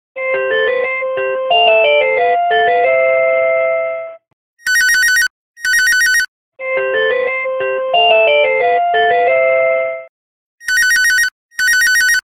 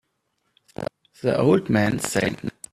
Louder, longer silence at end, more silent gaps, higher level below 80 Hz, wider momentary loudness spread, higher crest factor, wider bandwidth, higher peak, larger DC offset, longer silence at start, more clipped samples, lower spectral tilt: first, -12 LUFS vs -22 LUFS; about the same, 0.1 s vs 0.2 s; first, 4.33-4.57 s, 5.30-5.54 s, 6.28-6.52 s, 10.09-10.58 s, 11.32-11.49 s vs none; about the same, -56 dBFS vs -54 dBFS; second, 9 LU vs 15 LU; about the same, 14 dB vs 18 dB; first, 17 kHz vs 14.5 kHz; first, 0 dBFS vs -4 dBFS; neither; second, 0.15 s vs 0.8 s; neither; second, 0.5 dB/octave vs -5.5 dB/octave